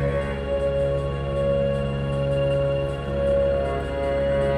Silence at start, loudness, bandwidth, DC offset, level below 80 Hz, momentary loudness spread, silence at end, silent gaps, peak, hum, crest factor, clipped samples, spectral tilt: 0 s; -24 LUFS; 10 kHz; under 0.1%; -32 dBFS; 4 LU; 0 s; none; -12 dBFS; none; 10 dB; under 0.1%; -8 dB/octave